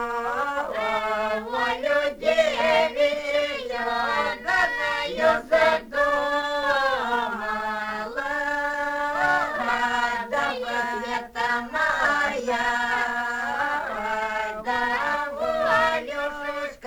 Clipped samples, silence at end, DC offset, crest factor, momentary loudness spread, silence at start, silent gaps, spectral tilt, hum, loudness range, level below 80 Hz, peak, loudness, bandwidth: under 0.1%; 0 s; under 0.1%; 18 dB; 7 LU; 0 s; none; -3 dB/octave; none; 2 LU; -52 dBFS; -6 dBFS; -24 LUFS; over 20 kHz